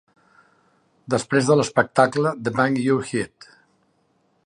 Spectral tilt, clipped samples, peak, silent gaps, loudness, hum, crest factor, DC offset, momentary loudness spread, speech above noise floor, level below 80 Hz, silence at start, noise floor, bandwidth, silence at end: -5.5 dB/octave; under 0.1%; -2 dBFS; none; -21 LUFS; none; 20 dB; under 0.1%; 9 LU; 45 dB; -62 dBFS; 1.1 s; -65 dBFS; 11 kHz; 1.2 s